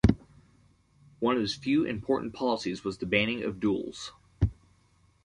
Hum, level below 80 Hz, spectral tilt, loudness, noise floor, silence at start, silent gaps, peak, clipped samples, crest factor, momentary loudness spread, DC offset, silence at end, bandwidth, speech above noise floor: none; -42 dBFS; -6.5 dB/octave; -30 LUFS; -65 dBFS; 0.05 s; none; -6 dBFS; under 0.1%; 24 dB; 9 LU; under 0.1%; 0.75 s; 11 kHz; 36 dB